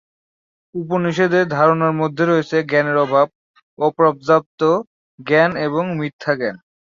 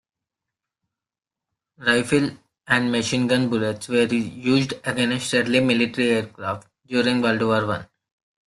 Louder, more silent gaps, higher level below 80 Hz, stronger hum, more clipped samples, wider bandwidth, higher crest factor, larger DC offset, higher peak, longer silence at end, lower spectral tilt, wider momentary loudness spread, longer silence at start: first, -17 LUFS vs -22 LUFS; first, 3.35-3.54 s, 3.63-3.77 s, 4.46-4.58 s, 4.87-5.18 s, 6.13-6.19 s vs none; about the same, -62 dBFS vs -60 dBFS; neither; neither; second, 7.4 kHz vs 12.5 kHz; about the same, 16 dB vs 20 dB; neither; about the same, -2 dBFS vs -4 dBFS; second, 0.3 s vs 0.65 s; first, -7 dB/octave vs -5 dB/octave; about the same, 8 LU vs 8 LU; second, 0.75 s vs 1.8 s